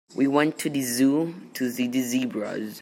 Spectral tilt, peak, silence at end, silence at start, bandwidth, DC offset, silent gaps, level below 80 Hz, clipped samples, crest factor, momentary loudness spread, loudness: -4.5 dB/octave; -6 dBFS; 0 s; 0.1 s; 16.5 kHz; under 0.1%; none; -74 dBFS; under 0.1%; 18 dB; 9 LU; -25 LUFS